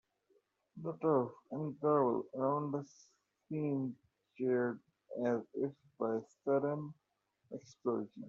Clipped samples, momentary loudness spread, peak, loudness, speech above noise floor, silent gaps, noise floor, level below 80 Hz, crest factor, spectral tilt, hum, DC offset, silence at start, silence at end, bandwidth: under 0.1%; 16 LU; -20 dBFS; -37 LUFS; 43 dB; none; -80 dBFS; -84 dBFS; 18 dB; -9 dB/octave; none; under 0.1%; 0.75 s; 0 s; 7.4 kHz